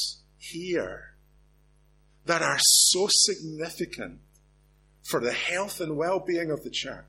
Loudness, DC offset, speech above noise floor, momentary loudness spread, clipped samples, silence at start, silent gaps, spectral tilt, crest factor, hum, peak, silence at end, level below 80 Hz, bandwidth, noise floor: -24 LUFS; under 0.1%; 35 dB; 21 LU; under 0.1%; 0 s; none; -1 dB/octave; 22 dB; 50 Hz at -55 dBFS; -6 dBFS; 0.05 s; -60 dBFS; 16.5 kHz; -61 dBFS